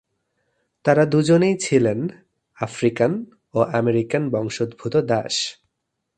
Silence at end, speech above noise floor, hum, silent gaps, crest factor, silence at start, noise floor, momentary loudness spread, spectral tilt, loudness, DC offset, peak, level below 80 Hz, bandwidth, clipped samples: 0.65 s; 58 dB; none; none; 20 dB; 0.85 s; -77 dBFS; 11 LU; -5.5 dB/octave; -21 LUFS; under 0.1%; 0 dBFS; -60 dBFS; 9.6 kHz; under 0.1%